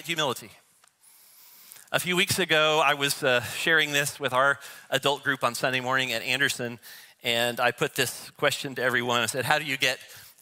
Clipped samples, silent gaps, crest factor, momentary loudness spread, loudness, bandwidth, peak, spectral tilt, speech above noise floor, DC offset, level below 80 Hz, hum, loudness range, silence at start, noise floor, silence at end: under 0.1%; none; 24 dB; 9 LU; -25 LUFS; 16 kHz; -4 dBFS; -2.5 dB/octave; 33 dB; under 0.1%; -70 dBFS; none; 3 LU; 0 s; -59 dBFS; 0.15 s